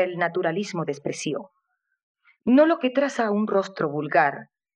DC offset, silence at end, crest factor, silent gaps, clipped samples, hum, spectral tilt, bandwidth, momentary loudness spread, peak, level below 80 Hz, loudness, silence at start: under 0.1%; 0.3 s; 18 dB; 2.03-2.15 s; under 0.1%; none; -5.5 dB/octave; 10.5 kHz; 12 LU; -6 dBFS; -74 dBFS; -23 LUFS; 0 s